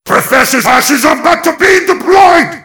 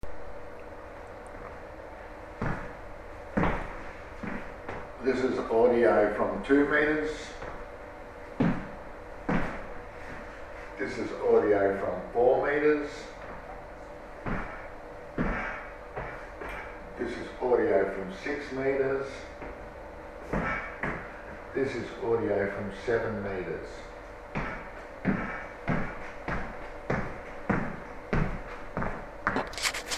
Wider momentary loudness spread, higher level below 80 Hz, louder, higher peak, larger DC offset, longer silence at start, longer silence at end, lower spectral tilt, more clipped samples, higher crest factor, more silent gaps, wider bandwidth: second, 4 LU vs 19 LU; about the same, -42 dBFS vs -46 dBFS; first, -7 LUFS vs -30 LUFS; first, 0 dBFS vs -10 dBFS; first, 0.4% vs under 0.1%; about the same, 0.05 s vs 0.05 s; about the same, 0.05 s vs 0 s; second, -2.5 dB/octave vs -6 dB/octave; first, 6% vs under 0.1%; second, 8 dB vs 22 dB; neither; first, 19.5 kHz vs 14.5 kHz